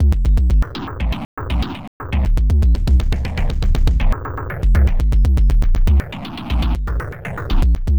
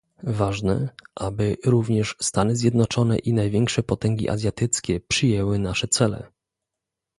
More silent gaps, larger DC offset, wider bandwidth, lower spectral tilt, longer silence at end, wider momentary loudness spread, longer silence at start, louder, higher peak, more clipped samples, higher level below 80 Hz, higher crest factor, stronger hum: first, 1.25-1.37 s, 1.87-2.00 s vs none; first, 0.8% vs under 0.1%; second, 8.2 kHz vs 11.5 kHz; first, -7.5 dB/octave vs -5 dB/octave; second, 0 s vs 0.95 s; first, 10 LU vs 5 LU; second, 0 s vs 0.25 s; first, -19 LUFS vs -23 LUFS; about the same, -6 dBFS vs -4 dBFS; neither; first, -16 dBFS vs -44 dBFS; second, 10 dB vs 18 dB; neither